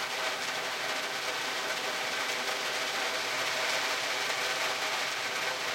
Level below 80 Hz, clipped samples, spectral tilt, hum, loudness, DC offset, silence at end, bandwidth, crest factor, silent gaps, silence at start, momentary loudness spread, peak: -76 dBFS; under 0.1%; 0 dB/octave; none; -30 LUFS; under 0.1%; 0 s; 16.5 kHz; 16 dB; none; 0 s; 3 LU; -18 dBFS